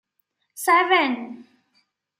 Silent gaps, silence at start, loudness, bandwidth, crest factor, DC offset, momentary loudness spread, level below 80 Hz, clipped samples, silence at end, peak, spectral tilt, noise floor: none; 0.55 s; -20 LUFS; 16 kHz; 18 dB; under 0.1%; 15 LU; -86 dBFS; under 0.1%; 0.75 s; -6 dBFS; -1.5 dB/octave; -73 dBFS